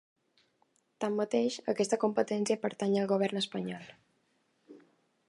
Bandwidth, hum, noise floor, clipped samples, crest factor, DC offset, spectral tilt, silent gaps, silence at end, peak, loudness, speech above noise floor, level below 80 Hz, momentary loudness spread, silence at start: 11.5 kHz; none; -74 dBFS; under 0.1%; 20 dB; under 0.1%; -5 dB/octave; none; 0.5 s; -14 dBFS; -32 LUFS; 43 dB; -84 dBFS; 8 LU; 1 s